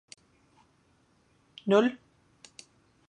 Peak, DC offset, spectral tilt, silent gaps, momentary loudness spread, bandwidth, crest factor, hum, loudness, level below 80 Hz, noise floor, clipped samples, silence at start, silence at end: -10 dBFS; under 0.1%; -6 dB/octave; none; 27 LU; 10.5 kHz; 24 dB; none; -27 LUFS; -78 dBFS; -67 dBFS; under 0.1%; 1.65 s; 1.15 s